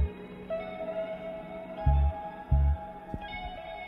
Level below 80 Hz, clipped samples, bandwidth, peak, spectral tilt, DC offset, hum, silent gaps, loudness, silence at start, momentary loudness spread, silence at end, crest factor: -32 dBFS; under 0.1%; 4.1 kHz; -14 dBFS; -9.5 dB/octave; under 0.1%; none; none; -33 LUFS; 0 s; 13 LU; 0 s; 18 dB